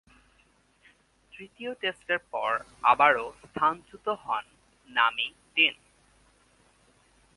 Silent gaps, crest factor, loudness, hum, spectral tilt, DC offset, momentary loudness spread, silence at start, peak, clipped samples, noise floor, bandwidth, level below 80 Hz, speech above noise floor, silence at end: none; 24 dB; -27 LUFS; none; -3.5 dB/octave; under 0.1%; 16 LU; 1.4 s; -6 dBFS; under 0.1%; -65 dBFS; 11.5 kHz; -66 dBFS; 37 dB; 1.65 s